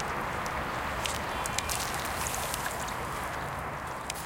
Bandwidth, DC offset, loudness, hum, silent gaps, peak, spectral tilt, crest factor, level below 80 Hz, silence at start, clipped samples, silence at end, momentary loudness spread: 17 kHz; under 0.1%; -33 LUFS; none; none; -8 dBFS; -2.5 dB/octave; 26 dB; -46 dBFS; 0 s; under 0.1%; 0 s; 5 LU